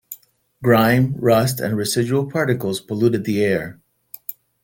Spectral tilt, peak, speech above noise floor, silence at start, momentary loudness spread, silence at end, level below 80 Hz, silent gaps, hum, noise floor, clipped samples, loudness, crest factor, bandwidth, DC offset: -6 dB/octave; -2 dBFS; 30 dB; 0.1 s; 17 LU; 0.3 s; -54 dBFS; none; none; -48 dBFS; under 0.1%; -19 LUFS; 16 dB; 17 kHz; under 0.1%